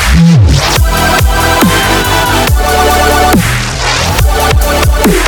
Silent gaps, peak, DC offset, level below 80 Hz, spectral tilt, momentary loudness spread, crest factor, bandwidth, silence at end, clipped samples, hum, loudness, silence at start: none; 0 dBFS; under 0.1%; -14 dBFS; -4.5 dB/octave; 3 LU; 8 dB; over 20 kHz; 0 s; 0.9%; none; -8 LUFS; 0 s